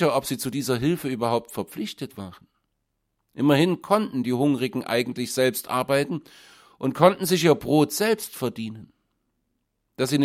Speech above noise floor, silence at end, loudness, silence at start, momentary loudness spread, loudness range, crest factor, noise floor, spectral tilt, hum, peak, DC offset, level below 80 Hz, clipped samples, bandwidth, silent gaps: 53 dB; 0 s; -24 LUFS; 0 s; 14 LU; 4 LU; 22 dB; -76 dBFS; -5 dB/octave; none; -2 dBFS; under 0.1%; -62 dBFS; under 0.1%; 16.5 kHz; none